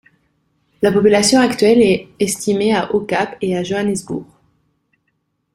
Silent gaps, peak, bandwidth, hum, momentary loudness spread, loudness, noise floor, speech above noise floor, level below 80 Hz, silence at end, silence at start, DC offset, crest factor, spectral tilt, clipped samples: none; 0 dBFS; 15.5 kHz; none; 9 LU; -15 LUFS; -69 dBFS; 54 dB; -52 dBFS; 1.3 s; 0.8 s; under 0.1%; 16 dB; -4.5 dB/octave; under 0.1%